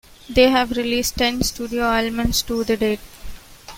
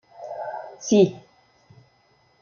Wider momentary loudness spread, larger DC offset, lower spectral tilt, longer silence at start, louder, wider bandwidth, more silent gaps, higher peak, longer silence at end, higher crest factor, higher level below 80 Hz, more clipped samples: second, 7 LU vs 16 LU; neither; second, -3.5 dB/octave vs -6 dB/octave; about the same, 0.3 s vs 0.2 s; first, -20 LUFS vs -23 LUFS; first, 16.5 kHz vs 7.2 kHz; neither; first, -2 dBFS vs -6 dBFS; second, 0 s vs 1.2 s; about the same, 18 dB vs 20 dB; first, -36 dBFS vs -70 dBFS; neither